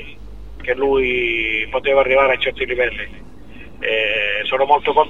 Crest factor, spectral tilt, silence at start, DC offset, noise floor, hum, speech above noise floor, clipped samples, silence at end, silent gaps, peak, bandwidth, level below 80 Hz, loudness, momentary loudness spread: 18 dB; -5.5 dB/octave; 0 s; 2%; -39 dBFS; none; 22 dB; under 0.1%; 0 s; none; 0 dBFS; 6.8 kHz; -40 dBFS; -17 LUFS; 11 LU